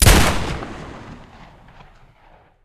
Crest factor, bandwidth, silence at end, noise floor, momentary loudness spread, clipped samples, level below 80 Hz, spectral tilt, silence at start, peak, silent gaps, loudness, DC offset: 20 dB; 15 kHz; 1.5 s; -51 dBFS; 25 LU; under 0.1%; -24 dBFS; -3.5 dB/octave; 0 s; 0 dBFS; none; -19 LUFS; under 0.1%